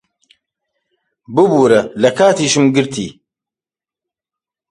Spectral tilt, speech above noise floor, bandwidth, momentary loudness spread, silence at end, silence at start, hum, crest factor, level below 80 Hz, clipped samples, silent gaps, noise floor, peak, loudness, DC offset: -4.5 dB/octave; 78 dB; 11.5 kHz; 10 LU; 1.6 s; 1.3 s; none; 16 dB; -56 dBFS; under 0.1%; none; -90 dBFS; 0 dBFS; -13 LUFS; under 0.1%